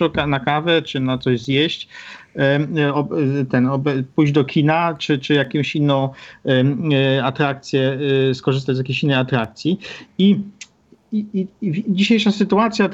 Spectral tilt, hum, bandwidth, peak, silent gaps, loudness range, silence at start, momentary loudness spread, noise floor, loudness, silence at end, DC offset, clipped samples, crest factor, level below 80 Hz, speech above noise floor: -7 dB/octave; none; 7.8 kHz; -2 dBFS; none; 2 LU; 0 s; 7 LU; -47 dBFS; -18 LUFS; 0 s; under 0.1%; under 0.1%; 16 dB; -54 dBFS; 29 dB